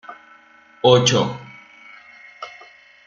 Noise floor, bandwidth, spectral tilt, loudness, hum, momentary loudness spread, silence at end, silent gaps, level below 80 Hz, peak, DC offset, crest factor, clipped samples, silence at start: -50 dBFS; 7.8 kHz; -4 dB/octave; -17 LUFS; none; 25 LU; 0.55 s; none; -60 dBFS; -2 dBFS; under 0.1%; 20 dB; under 0.1%; 0.1 s